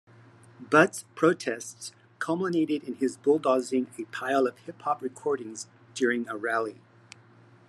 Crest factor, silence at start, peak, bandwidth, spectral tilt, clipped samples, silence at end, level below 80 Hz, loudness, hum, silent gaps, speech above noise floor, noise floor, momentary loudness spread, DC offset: 22 dB; 0.6 s; -6 dBFS; 13 kHz; -5 dB/octave; under 0.1%; 0.95 s; -84 dBFS; -28 LUFS; none; none; 29 dB; -56 dBFS; 13 LU; under 0.1%